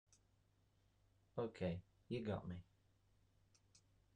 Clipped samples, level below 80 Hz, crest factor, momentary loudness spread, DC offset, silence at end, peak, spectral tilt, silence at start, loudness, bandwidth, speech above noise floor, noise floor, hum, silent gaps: under 0.1%; -74 dBFS; 20 dB; 9 LU; under 0.1%; 1.55 s; -32 dBFS; -7.5 dB/octave; 1.35 s; -48 LUFS; 9.8 kHz; 32 dB; -78 dBFS; none; none